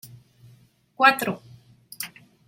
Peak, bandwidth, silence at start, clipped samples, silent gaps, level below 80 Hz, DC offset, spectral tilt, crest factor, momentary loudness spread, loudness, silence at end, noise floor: -4 dBFS; 16.5 kHz; 0.05 s; under 0.1%; none; -72 dBFS; under 0.1%; -3 dB/octave; 24 dB; 18 LU; -20 LUFS; 0.4 s; -57 dBFS